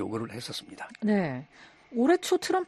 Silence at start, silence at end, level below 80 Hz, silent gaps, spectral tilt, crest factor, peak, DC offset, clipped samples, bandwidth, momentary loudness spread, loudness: 0 s; 0 s; -68 dBFS; none; -5 dB/octave; 18 dB; -12 dBFS; under 0.1%; under 0.1%; 13 kHz; 13 LU; -29 LUFS